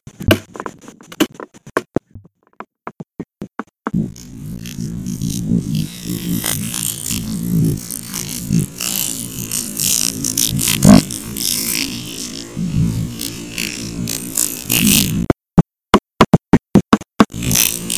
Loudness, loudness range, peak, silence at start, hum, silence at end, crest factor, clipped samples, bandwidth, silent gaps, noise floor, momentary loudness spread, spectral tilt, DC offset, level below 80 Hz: -17 LUFS; 12 LU; 0 dBFS; 0.2 s; none; 0 s; 18 dB; under 0.1%; 16 kHz; none; -43 dBFS; 16 LU; -4 dB/octave; 0.2%; -36 dBFS